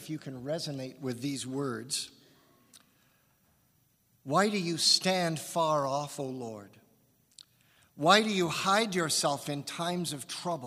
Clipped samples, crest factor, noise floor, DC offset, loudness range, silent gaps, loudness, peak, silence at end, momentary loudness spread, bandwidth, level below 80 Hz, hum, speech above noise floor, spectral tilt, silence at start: under 0.1%; 26 dB; -70 dBFS; under 0.1%; 9 LU; none; -30 LUFS; -6 dBFS; 0 s; 14 LU; 15.5 kHz; -76 dBFS; none; 39 dB; -3.5 dB/octave; 0 s